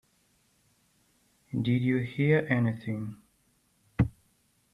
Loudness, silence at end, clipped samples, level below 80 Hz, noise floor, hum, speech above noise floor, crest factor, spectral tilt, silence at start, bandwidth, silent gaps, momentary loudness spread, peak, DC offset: -29 LUFS; 0.65 s; under 0.1%; -52 dBFS; -69 dBFS; none; 42 dB; 20 dB; -9 dB/octave; 1.55 s; 11 kHz; none; 12 LU; -10 dBFS; under 0.1%